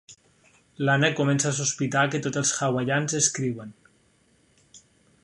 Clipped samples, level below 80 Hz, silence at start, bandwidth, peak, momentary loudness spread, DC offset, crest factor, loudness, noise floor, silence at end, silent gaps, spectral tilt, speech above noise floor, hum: under 0.1%; -66 dBFS; 0.1 s; 11.5 kHz; -6 dBFS; 8 LU; under 0.1%; 20 dB; -24 LUFS; -63 dBFS; 0.45 s; none; -3.5 dB/octave; 39 dB; none